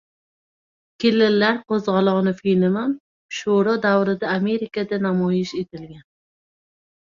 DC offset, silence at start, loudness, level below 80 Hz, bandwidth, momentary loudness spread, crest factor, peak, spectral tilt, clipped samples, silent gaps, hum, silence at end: under 0.1%; 1 s; -20 LUFS; -62 dBFS; 7.4 kHz; 11 LU; 16 dB; -6 dBFS; -6.5 dB/octave; under 0.1%; 3.00-3.29 s; none; 1.2 s